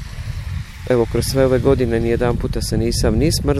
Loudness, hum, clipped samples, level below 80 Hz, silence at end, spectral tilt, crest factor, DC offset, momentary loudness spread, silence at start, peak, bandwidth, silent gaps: -18 LUFS; none; under 0.1%; -26 dBFS; 0 s; -6 dB/octave; 14 dB; under 0.1%; 13 LU; 0 s; -2 dBFS; 16 kHz; none